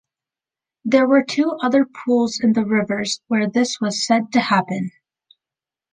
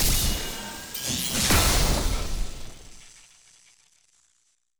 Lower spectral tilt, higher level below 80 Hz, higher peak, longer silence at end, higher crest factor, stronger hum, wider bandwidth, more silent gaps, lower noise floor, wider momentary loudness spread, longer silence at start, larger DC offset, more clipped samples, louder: first, -4.5 dB/octave vs -2.5 dB/octave; second, -66 dBFS vs -30 dBFS; first, -2 dBFS vs -8 dBFS; second, 1.05 s vs 1.7 s; about the same, 18 dB vs 18 dB; neither; second, 9.8 kHz vs over 20 kHz; neither; first, -89 dBFS vs -70 dBFS; second, 6 LU vs 20 LU; first, 0.85 s vs 0 s; neither; neither; first, -19 LUFS vs -25 LUFS